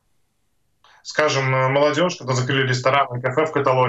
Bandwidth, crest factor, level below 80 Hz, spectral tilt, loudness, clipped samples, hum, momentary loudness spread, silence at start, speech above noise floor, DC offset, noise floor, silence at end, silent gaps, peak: 8.2 kHz; 20 dB; -64 dBFS; -5 dB/octave; -19 LUFS; under 0.1%; none; 4 LU; 1.05 s; 51 dB; under 0.1%; -70 dBFS; 0 s; none; 0 dBFS